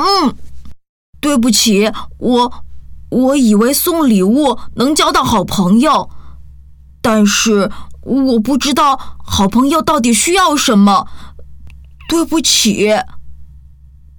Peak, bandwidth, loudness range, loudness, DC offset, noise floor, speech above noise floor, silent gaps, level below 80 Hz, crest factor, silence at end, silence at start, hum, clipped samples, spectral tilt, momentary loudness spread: 0 dBFS; over 20 kHz; 2 LU; -12 LUFS; under 0.1%; -39 dBFS; 28 dB; 0.89-1.13 s; -36 dBFS; 12 dB; 0.6 s; 0 s; none; under 0.1%; -4 dB/octave; 9 LU